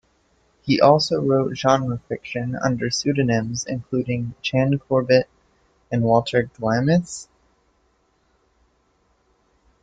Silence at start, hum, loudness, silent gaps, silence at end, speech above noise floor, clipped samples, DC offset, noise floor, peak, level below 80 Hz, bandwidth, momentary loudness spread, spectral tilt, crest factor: 0.65 s; none; -21 LUFS; none; 2.6 s; 44 dB; under 0.1%; under 0.1%; -64 dBFS; 0 dBFS; -54 dBFS; 9.2 kHz; 10 LU; -5.5 dB/octave; 22 dB